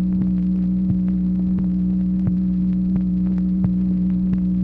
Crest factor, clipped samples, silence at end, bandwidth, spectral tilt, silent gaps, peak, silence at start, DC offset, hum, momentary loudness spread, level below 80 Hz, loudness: 12 dB; under 0.1%; 0 s; 2.1 kHz; -12.5 dB/octave; none; -8 dBFS; 0 s; under 0.1%; none; 1 LU; -34 dBFS; -20 LUFS